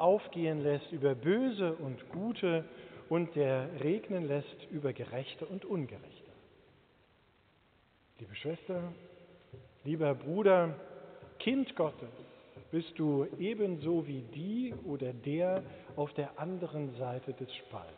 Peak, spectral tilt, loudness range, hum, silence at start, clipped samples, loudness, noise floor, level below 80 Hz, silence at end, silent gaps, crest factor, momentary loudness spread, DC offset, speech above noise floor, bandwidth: -16 dBFS; -6 dB/octave; 12 LU; none; 0 s; under 0.1%; -35 LUFS; -68 dBFS; -74 dBFS; 0 s; none; 20 dB; 18 LU; under 0.1%; 34 dB; 4.6 kHz